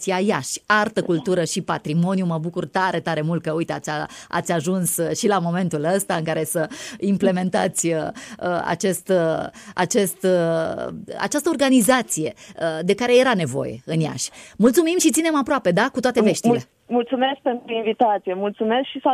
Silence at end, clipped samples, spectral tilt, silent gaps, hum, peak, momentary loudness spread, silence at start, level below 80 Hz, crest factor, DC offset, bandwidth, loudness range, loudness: 0 s; under 0.1%; -4.5 dB/octave; none; none; -4 dBFS; 9 LU; 0 s; -60 dBFS; 16 dB; under 0.1%; 15.5 kHz; 3 LU; -21 LUFS